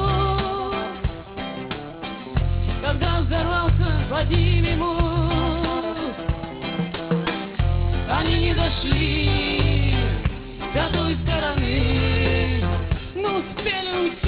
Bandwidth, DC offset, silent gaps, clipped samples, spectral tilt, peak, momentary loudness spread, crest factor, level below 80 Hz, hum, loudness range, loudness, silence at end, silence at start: 4 kHz; under 0.1%; none; under 0.1%; -10.5 dB/octave; -6 dBFS; 9 LU; 16 dB; -26 dBFS; none; 3 LU; -23 LUFS; 0 s; 0 s